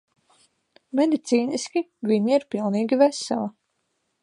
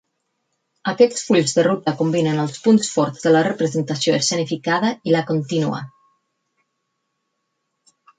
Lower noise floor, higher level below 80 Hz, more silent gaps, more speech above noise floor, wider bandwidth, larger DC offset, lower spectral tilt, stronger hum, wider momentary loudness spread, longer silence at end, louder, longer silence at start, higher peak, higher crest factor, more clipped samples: about the same, -74 dBFS vs -74 dBFS; second, -76 dBFS vs -66 dBFS; neither; second, 52 dB vs 56 dB; first, 11 kHz vs 9.4 kHz; neither; about the same, -5 dB/octave vs -5 dB/octave; neither; about the same, 8 LU vs 6 LU; second, 0.7 s vs 2.3 s; second, -23 LUFS vs -19 LUFS; about the same, 0.95 s vs 0.85 s; second, -6 dBFS vs -2 dBFS; about the same, 20 dB vs 18 dB; neither